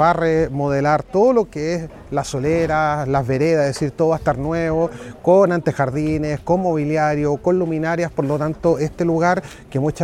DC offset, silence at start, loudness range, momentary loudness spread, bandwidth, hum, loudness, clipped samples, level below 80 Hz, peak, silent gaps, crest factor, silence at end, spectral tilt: under 0.1%; 0 s; 1 LU; 7 LU; 13 kHz; none; -19 LUFS; under 0.1%; -42 dBFS; -2 dBFS; none; 16 dB; 0 s; -7 dB/octave